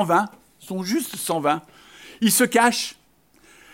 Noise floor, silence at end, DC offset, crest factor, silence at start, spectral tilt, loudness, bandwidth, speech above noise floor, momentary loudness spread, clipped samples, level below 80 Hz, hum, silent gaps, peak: -58 dBFS; 0.8 s; under 0.1%; 20 dB; 0 s; -3 dB/octave; -21 LUFS; 16.5 kHz; 36 dB; 14 LU; under 0.1%; -68 dBFS; none; none; -4 dBFS